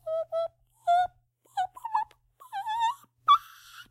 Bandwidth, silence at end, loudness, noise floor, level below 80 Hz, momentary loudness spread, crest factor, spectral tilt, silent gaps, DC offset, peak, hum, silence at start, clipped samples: 16 kHz; 0.05 s; -29 LUFS; -62 dBFS; -70 dBFS; 16 LU; 20 dB; -1 dB/octave; none; under 0.1%; -10 dBFS; none; 0.05 s; under 0.1%